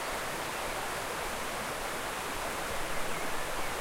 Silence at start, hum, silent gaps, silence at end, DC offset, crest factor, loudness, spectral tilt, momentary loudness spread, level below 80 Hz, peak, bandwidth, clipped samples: 0 s; none; none; 0 s; under 0.1%; 14 dB; -35 LUFS; -2 dB/octave; 0 LU; -48 dBFS; -20 dBFS; 16 kHz; under 0.1%